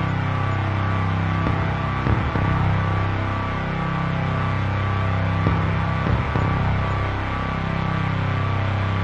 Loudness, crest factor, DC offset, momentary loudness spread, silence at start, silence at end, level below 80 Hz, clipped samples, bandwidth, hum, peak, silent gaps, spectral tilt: -22 LUFS; 18 dB; under 0.1%; 3 LU; 0 s; 0 s; -32 dBFS; under 0.1%; 7.2 kHz; none; -4 dBFS; none; -8 dB/octave